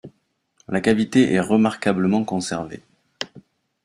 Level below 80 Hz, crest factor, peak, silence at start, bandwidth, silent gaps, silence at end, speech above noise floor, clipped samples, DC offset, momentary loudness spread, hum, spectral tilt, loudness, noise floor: -58 dBFS; 18 dB; -4 dBFS; 0.05 s; 11.5 kHz; none; 0.45 s; 48 dB; under 0.1%; under 0.1%; 15 LU; none; -6 dB/octave; -20 LUFS; -68 dBFS